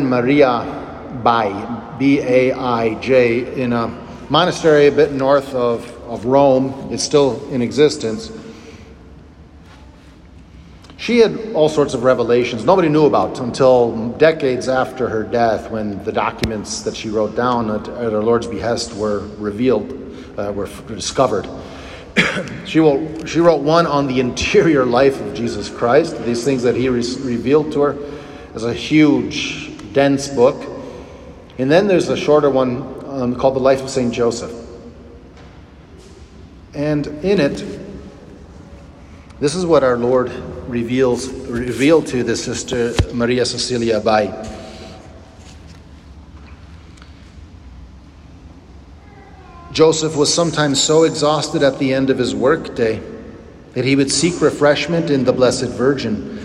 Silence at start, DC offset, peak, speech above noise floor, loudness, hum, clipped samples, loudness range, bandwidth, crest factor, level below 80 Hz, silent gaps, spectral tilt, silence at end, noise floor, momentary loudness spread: 0 s; under 0.1%; 0 dBFS; 25 dB; -16 LUFS; none; under 0.1%; 7 LU; 12 kHz; 16 dB; -42 dBFS; none; -5 dB/octave; 0 s; -41 dBFS; 15 LU